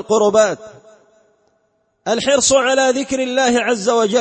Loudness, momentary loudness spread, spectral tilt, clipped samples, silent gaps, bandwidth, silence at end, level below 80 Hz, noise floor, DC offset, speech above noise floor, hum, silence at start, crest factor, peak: -15 LUFS; 7 LU; -2.5 dB/octave; under 0.1%; none; 8.8 kHz; 0 s; -54 dBFS; -64 dBFS; under 0.1%; 49 dB; none; 0 s; 14 dB; -2 dBFS